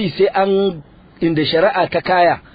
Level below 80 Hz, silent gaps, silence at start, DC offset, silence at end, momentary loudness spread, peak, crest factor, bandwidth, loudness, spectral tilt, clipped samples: -48 dBFS; none; 0 s; under 0.1%; 0.15 s; 7 LU; -2 dBFS; 14 dB; 5 kHz; -16 LUFS; -9 dB/octave; under 0.1%